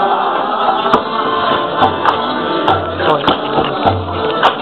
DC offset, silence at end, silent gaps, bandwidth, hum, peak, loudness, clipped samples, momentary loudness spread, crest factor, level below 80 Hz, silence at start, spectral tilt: 0.4%; 0 s; none; 9.6 kHz; none; 0 dBFS; -14 LUFS; under 0.1%; 3 LU; 14 dB; -44 dBFS; 0 s; -6.5 dB/octave